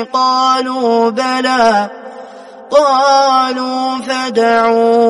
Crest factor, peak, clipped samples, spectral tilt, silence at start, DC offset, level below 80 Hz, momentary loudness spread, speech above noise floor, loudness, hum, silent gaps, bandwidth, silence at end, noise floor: 12 dB; 0 dBFS; under 0.1%; -3 dB/octave; 0 s; under 0.1%; -60 dBFS; 8 LU; 21 dB; -12 LUFS; none; none; 11.5 kHz; 0 s; -33 dBFS